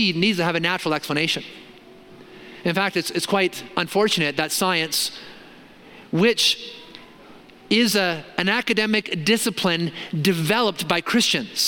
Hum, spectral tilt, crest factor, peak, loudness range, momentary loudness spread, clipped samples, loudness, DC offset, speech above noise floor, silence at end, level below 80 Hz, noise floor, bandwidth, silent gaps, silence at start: none; -3.5 dB/octave; 22 dB; -2 dBFS; 3 LU; 8 LU; under 0.1%; -21 LUFS; under 0.1%; 24 dB; 0 s; -62 dBFS; -46 dBFS; 17 kHz; none; 0 s